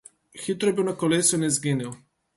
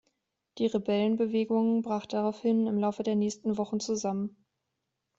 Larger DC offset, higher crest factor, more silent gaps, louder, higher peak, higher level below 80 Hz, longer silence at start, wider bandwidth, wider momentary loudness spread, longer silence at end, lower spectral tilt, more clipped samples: neither; about the same, 18 dB vs 14 dB; neither; first, -23 LUFS vs -29 LUFS; first, -8 dBFS vs -16 dBFS; first, -64 dBFS vs -72 dBFS; second, 0.35 s vs 0.55 s; first, 12 kHz vs 7.8 kHz; first, 12 LU vs 5 LU; second, 0.4 s vs 0.9 s; second, -4 dB/octave vs -6 dB/octave; neither